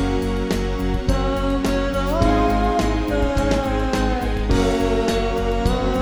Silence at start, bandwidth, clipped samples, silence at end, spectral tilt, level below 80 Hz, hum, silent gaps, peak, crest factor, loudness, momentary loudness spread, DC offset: 0 s; over 20 kHz; under 0.1%; 0 s; -6 dB/octave; -24 dBFS; none; none; -4 dBFS; 14 dB; -21 LUFS; 4 LU; under 0.1%